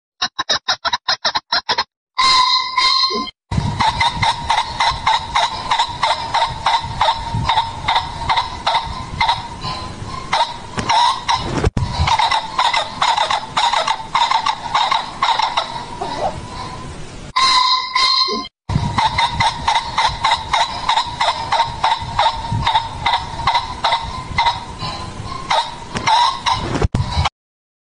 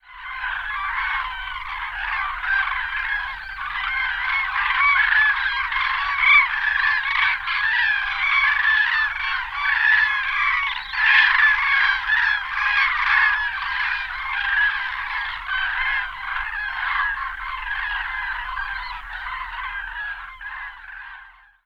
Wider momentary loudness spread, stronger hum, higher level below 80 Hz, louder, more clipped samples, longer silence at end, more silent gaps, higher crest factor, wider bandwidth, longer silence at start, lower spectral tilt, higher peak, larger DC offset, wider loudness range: second, 10 LU vs 14 LU; neither; first, -34 dBFS vs -44 dBFS; first, -17 LUFS vs -20 LUFS; neither; first, 0.6 s vs 0.35 s; first, 1.96-2.07 s vs none; second, 14 dB vs 20 dB; first, 10.5 kHz vs 6.8 kHz; first, 0.2 s vs 0.05 s; first, -3 dB/octave vs -0.5 dB/octave; about the same, -4 dBFS vs -4 dBFS; neither; second, 4 LU vs 9 LU